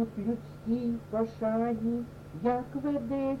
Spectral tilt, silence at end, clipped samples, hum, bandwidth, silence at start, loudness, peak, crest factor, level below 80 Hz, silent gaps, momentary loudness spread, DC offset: -9 dB/octave; 0 s; under 0.1%; none; 7.2 kHz; 0 s; -32 LUFS; -16 dBFS; 16 dB; -56 dBFS; none; 5 LU; under 0.1%